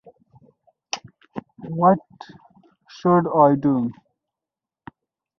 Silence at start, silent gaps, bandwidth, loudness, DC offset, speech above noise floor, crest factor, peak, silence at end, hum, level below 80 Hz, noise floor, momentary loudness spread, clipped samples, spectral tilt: 0.95 s; none; 7 kHz; -20 LUFS; under 0.1%; 70 dB; 20 dB; -2 dBFS; 1.5 s; none; -64 dBFS; -88 dBFS; 21 LU; under 0.1%; -7 dB/octave